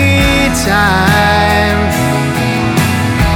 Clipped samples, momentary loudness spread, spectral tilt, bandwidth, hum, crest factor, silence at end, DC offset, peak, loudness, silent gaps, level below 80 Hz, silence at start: under 0.1%; 4 LU; -5 dB/octave; 18 kHz; none; 10 dB; 0 s; under 0.1%; 0 dBFS; -11 LUFS; none; -24 dBFS; 0 s